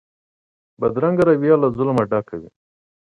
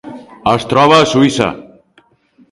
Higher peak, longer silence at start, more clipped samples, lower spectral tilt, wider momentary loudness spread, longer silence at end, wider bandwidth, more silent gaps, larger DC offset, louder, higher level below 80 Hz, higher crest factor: about the same, -2 dBFS vs 0 dBFS; first, 0.8 s vs 0.05 s; neither; first, -9.5 dB/octave vs -5 dB/octave; second, 11 LU vs 17 LU; second, 0.6 s vs 0.9 s; second, 10 kHz vs 11.5 kHz; neither; neither; second, -18 LUFS vs -11 LUFS; second, -54 dBFS vs -46 dBFS; about the same, 18 dB vs 14 dB